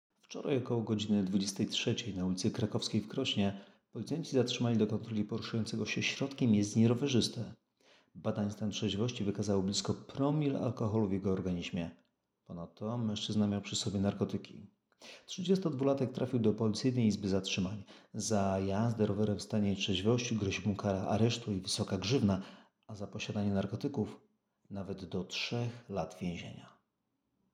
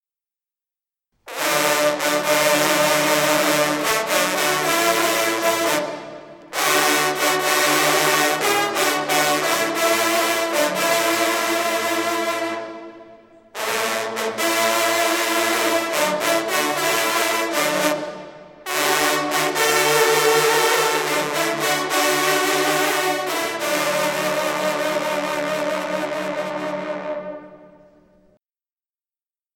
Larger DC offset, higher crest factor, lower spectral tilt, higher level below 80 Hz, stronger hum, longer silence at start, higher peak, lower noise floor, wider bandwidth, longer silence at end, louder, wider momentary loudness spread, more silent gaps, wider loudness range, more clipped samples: neither; about the same, 18 dB vs 20 dB; first, -5.5 dB/octave vs -1.5 dB/octave; second, -74 dBFS vs -64 dBFS; neither; second, 0.3 s vs 1.25 s; second, -16 dBFS vs 0 dBFS; second, -83 dBFS vs under -90 dBFS; second, 11.5 kHz vs 19 kHz; second, 0.85 s vs 1.9 s; second, -34 LUFS vs -19 LUFS; first, 12 LU vs 9 LU; neither; about the same, 4 LU vs 6 LU; neither